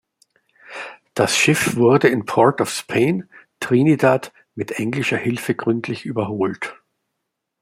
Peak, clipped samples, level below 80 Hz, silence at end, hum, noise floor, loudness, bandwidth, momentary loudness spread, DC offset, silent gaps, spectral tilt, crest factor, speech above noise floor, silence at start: -2 dBFS; under 0.1%; -60 dBFS; 0.9 s; none; -78 dBFS; -19 LUFS; 16 kHz; 16 LU; under 0.1%; none; -5 dB/octave; 18 dB; 60 dB; 0.7 s